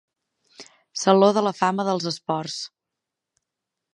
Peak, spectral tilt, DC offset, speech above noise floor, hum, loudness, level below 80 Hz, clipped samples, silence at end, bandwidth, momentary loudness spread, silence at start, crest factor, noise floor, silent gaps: -2 dBFS; -5 dB/octave; under 0.1%; 64 dB; none; -22 LUFS; -76 dBFS; under 0.1%; 1.3 s; 11.5 kHz; 16 LU; 0.6 s; 22 dB; -85 dBFS; none